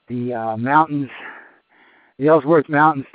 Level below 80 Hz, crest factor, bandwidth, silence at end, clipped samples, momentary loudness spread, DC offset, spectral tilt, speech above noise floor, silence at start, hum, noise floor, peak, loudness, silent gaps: -68 dBFS; 18 dB; 4.8 kHz; 0.1 s; under 0.1%; 16 LU; under 0.1%; -6 dB/octave; 37 dB; 0.1 s; none; -54 dBFS; -2 dBFS; -17 LUFS; none